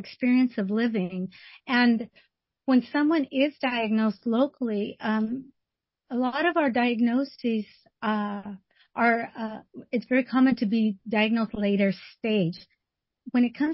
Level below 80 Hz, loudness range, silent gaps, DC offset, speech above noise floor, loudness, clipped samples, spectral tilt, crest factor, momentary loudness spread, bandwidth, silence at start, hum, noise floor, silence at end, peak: -66 dBFS; 2 LU; none; under 0.1%; 60 dB; -26 LUFS; under 0.1%; -10.5 dB/octave; 16 dB; 13 LU; 5.8 kHz; 0 s; none; -85 dBFS; 0 s; -10 dBFS